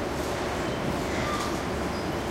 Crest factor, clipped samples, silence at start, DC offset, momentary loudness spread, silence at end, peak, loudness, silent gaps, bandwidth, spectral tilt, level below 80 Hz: 14 dB; under 0.1%; 0 s; under 0.1%; 2 LU; 0 s; -16 dBFS; -29 LUFS; none; 16 kHz; -5 dB/octave; -42 dBFS